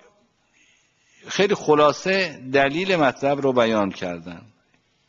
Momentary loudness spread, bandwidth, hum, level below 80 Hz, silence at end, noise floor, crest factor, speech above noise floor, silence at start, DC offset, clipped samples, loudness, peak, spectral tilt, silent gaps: 13 LU; 7.6 kHz; none; -60 dBFS; 0.7 s; -64 dBFS; 18 dB; 44 dB; 1.25 s; under 0.1%; under 0.1%; -20 LUFS; -4 dBFS; -5 dB/octave; none